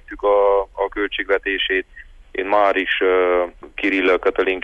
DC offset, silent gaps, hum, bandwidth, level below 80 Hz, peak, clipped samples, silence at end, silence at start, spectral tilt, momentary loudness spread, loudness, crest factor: under 0.1%; none; none; 6.6 kHz; -46 dBFS; -6 dBFS; under 0.1%; 0 s; 0.1 s; -5 dB/octave; 8 LU; -19 LUFS; 14 dB